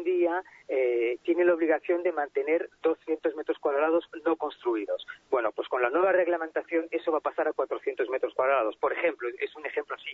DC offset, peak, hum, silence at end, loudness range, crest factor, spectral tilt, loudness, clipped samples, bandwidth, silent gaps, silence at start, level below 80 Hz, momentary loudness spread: under 0.1%; -12 dBFS; none; 0 s; 2 LU; 16 dB; -6 dB/octave; -28 LUFS; under 0.1%; 4.2 kHz; none; 0 s; -76 dBFS; 8 LU